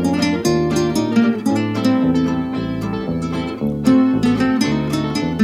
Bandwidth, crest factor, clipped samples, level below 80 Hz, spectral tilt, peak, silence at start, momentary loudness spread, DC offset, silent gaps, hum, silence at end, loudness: 14.5 kHz; 16 dB; under 0.1%; -42 dBFS; -6 dB/octave; -2 dBFS; 0 s; 7 LU; under 0.1%; none; none; 0 s; -18 LUFS